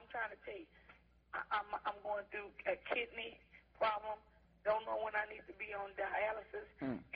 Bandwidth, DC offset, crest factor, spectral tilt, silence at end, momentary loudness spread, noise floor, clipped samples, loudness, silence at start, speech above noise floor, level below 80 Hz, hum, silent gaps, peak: 5.2 kHz; under 0.1%; 20 dB; -1.5 dB/octave; 0 s; 12 LU; -65 dBFS; under 0.1%; -42 LUFS; 0 s; 23 dB; -70 dBFS; none; none; -24 dBFS